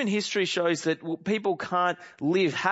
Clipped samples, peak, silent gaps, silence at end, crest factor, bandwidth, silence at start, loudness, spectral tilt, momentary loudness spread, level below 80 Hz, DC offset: under 0.1%; -8 dBFS; none; 0 s; 18 dB; 8 kHz; 0 s; -27 LUFS; -4.5 dB/octave; 5 LU; -74 dBFS; under 0.1%